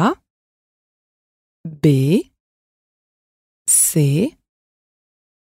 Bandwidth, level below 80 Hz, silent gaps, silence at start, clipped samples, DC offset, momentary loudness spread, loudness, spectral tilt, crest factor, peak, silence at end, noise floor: 16 kHz; -58 dBFS; 0.30-1.64 s, 2.40-3.65 s; 0 s; under 0.1%; under 0.1%; 19 LU; -16 LUFS; -5 dB/octave; 18 dB; -2 dBFS; 1.2 s; under -90 dBFS